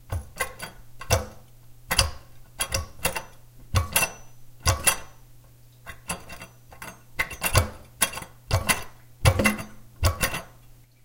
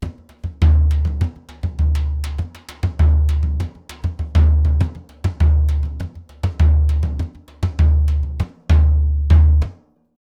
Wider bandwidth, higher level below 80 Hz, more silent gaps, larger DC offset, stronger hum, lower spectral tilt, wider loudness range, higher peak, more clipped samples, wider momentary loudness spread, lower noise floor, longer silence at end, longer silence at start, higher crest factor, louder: first, 17 kHz vs 5.8 kHz; second, -38 dBFS vs -18 dBFS; neither; neither; neither; second, -3 dB/octave vs -8 dB/octave; about the same, 4 LU vs 3 LU; about the same, 0 dBFS vs -2 dBFS; neither; first, 20 LU vs 13 LU; first, -51 dBFS vs -39 dBFS; about the same, 0.55 s vs 0.6 s; about the same, 0 s vs 0 s; first, 28 dB vs 16 dB; second, -26 LUFS vs -18 LUFS